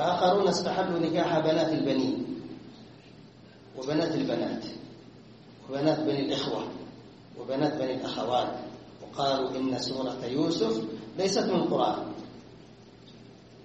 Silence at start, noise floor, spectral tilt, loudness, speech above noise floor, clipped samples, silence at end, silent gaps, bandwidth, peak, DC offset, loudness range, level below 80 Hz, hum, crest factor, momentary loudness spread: 0 s; -51 dBFS; -5.5 dB/octave; -29 LUFS; 24 dB; under 0.1%; 0 s; none; 8.4 kHz; -12 dBFS; under 0.1%; 4 LU; -64 dBFS; none; 18 dB; 21 LU